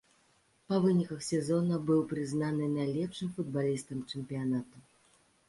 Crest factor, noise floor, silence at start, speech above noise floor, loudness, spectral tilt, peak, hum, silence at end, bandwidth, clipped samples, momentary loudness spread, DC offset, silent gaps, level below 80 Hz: 16 dB; -69 dBFS; 0.7 s; 37 dB; -32 LUFS; -7 dB/octave; -18 dBFS; none; 0.7 s; 11.5 kHz; under 0.1%; 8 LU; under 0.1%; none; -70 dBFS